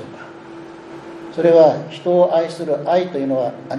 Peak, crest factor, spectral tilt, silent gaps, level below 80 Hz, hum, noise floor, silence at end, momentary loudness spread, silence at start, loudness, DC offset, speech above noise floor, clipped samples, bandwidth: 0 dBFS; 16 dB; -7 dB/octave; none; -66 dBFS; none; -36 dBFS; 0 s; 24 LU; 0 s; -16 LUFS; under 0.1%; 20 dB; under 0.1%; 10.5 kHz